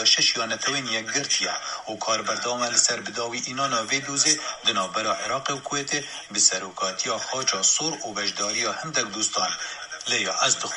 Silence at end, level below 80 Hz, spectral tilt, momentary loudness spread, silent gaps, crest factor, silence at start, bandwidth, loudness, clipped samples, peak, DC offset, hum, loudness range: 0 s; -68 dBFS; -0.5 dB/octave; 8 LU; none; 22 dB; 0 s; 11.5 kHz; -23 LUFS; under 0.1%; -4 dBFS; under 0.1%; none; 1 LU